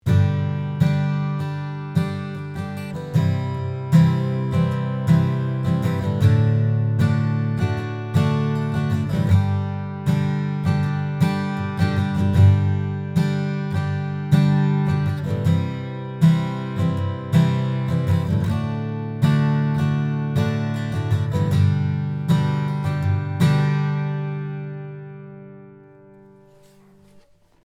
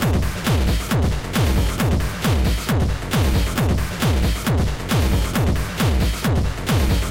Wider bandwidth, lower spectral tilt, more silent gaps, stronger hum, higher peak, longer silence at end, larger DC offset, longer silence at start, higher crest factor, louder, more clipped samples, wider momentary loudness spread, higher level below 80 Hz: second, 12.5 kHz vs 17 kHz; first, -8 dB/octave vs -5.5 dB/octave; neither; first, 50 Hz at -40 dBFS vs none; first, -4 dBFS vs -10 dBFS; first, 1.9 s vs 0 s; neither; about the same, 0.05 s vs 0 s; first, 16 dB vs 10 dB; about the same, -21 LUFS vs -20 LUFS; neither; first, 9 LU vs 2 LU; second, -52 dBFS vs -24 dBFS